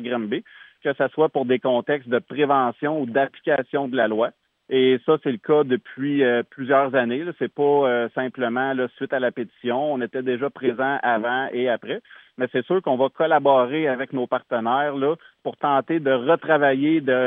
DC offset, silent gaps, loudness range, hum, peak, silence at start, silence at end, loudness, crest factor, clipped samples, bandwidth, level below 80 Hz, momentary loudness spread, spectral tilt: under 0.1%; none; 3 LU; none; -4 dBFS; 0 s; 0 s; -22 LUFS; 18 dB; under 0.1%; 3.9 kHz; -82 dBFS; 8 LU; -9.5 dB/octave